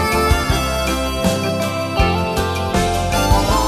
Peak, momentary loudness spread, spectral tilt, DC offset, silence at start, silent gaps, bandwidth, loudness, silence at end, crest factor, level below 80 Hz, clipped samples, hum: 0 dBFS; 4 LU; -4.5 dB/octave; under 0.1%; 0 s; none; 14 kHz; -18 LUFS; 0 s; 16 dB; -24 dBFS; under 0.1%; none